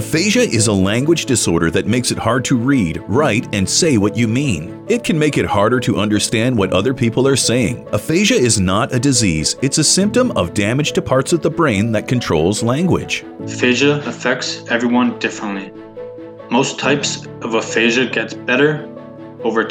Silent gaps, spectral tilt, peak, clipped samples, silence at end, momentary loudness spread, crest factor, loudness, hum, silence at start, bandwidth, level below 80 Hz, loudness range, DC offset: none; -4.5 dB/octave; -2 dBFS; under 0.1%; 0 s; 9 LU; 14 dB; -16 LUFS; none; 0 s; over 20 kHz; -44 dBFS; 4 LU; under 0.1%